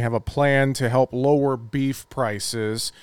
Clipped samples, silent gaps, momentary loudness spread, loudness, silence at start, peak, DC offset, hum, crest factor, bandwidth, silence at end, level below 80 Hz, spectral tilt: under 0.1%; none; 7 LU; -22 LUFS; 0 s; -6 dBFS; under 0.1%; none; 16 dB; 17.5 kHz; 0 s; -48 dBFS; -5.5 dB/octave